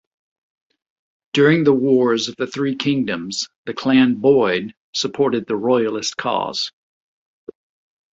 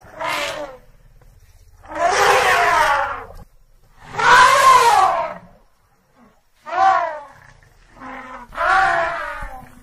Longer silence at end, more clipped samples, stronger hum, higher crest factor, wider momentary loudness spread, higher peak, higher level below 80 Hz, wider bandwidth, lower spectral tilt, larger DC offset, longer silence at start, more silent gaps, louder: first, 1.45 s vs 0.2 s; neither; neither; about the same, 18 dB vs 18 dB; second, 10 LU vs 23 LU; about the same, -2 dBFS vs -2 dBFS; second, -62 dBFS vs -44 dBFS; second, 7.8 kHz vs 15 kHz; first, -5 dB/octave vs -1.5 dB/octave; neither; first, 1.35 s vs 0.15 s; first, 3.56-3.64 s, 4.77-4.93 s vs none; second, -18 LUFS vs -15 LUFS